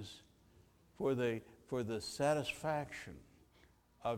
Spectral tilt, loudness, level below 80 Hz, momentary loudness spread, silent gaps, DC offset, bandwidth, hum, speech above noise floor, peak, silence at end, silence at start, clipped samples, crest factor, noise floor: -5 dB/octave; -39 LUFS; -68 dBFS; 18 LU; none; under 0.1%; 17 kHz; none; 30 dB; -20 dBFS; 0 s; 0 s; under 0.1%; 20 dB; -68 dBFS